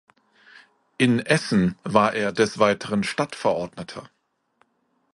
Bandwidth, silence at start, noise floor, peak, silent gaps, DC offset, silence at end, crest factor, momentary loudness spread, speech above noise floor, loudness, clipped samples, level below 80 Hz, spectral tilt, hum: 11.5 kHz; 1 s; -69 dBFS; -2 dBFS; none; under 0.1%; 1.05 s; 22 dB; 13 LU; 47 dB; -22 LUFS; under 0.1%; -58 dBFS; -5.5 dB/octave; none